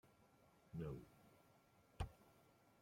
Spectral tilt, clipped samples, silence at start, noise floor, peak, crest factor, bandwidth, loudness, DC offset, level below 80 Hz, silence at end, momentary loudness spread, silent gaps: -7 dB/octave; under 0.1%; 0.05 s; -74 dBFS; -34 dBFS; 24 dB; 16.5 kHz; -54 LUFS; under 0.1%; -64 dBFS; 0.1 s; 6 LU; none